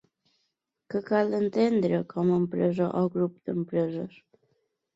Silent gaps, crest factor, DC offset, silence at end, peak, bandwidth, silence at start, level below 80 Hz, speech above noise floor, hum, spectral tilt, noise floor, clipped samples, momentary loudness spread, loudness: none; 16 dB; under 0.1%; 0.9 s; -12 dBFS; 7.8 kHz; 0.9 s; -68 dBFS; 53 dB; none; -9 dB/octave; -79 dBFS; under 0.1%; 9 LU; -27 LUFS